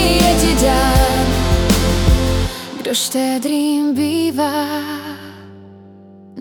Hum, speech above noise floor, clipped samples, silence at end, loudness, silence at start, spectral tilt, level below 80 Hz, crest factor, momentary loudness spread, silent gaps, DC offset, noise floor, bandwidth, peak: none; 23 dB; under 0.1%; 0 s; -16 LUFS; 0 s; -4.5 dB/octave; -22 dBFS; 14 dB; 12 LU; none; under 0.1%; -40 dBFS; 19 kHz; 0 dBFS